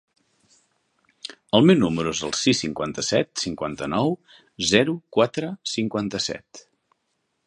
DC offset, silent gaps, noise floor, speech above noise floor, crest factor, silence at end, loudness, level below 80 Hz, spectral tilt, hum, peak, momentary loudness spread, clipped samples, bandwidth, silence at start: under 0.1%; none; -74 dBFS; 52 dB; 22 dB; 0.85 s; -22 LUFS; -56 dBFS; -4.5 dB/octave; none; -2 dBFS; 11 LU; under 0.1%; 11 kHz; 1.3 s